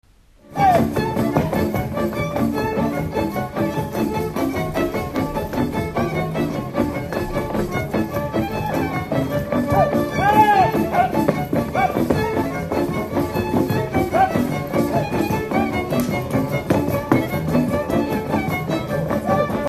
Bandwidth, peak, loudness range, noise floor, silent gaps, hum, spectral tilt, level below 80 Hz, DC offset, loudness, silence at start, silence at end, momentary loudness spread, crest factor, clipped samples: 15 kHz; 0 dBFS; 5 LU; -48 dBFS; none; none; -7 dB/octave; -40 dBFS; under 0.1%; -21 LUFS; 0.5 s; 0 s; 5 LU; 20 dB; under 0.1%